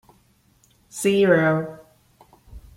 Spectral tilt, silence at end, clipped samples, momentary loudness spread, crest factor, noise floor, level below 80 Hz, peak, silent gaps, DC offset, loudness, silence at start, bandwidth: -5.5 dB/octave; 0.15 s; under 0.1%; 19 LU; 20 dB; -60 dBFS; -52 dBFS; -4 dBFS; none; under 0.1%; -20 LUFS; 0.95 s; 16 kHz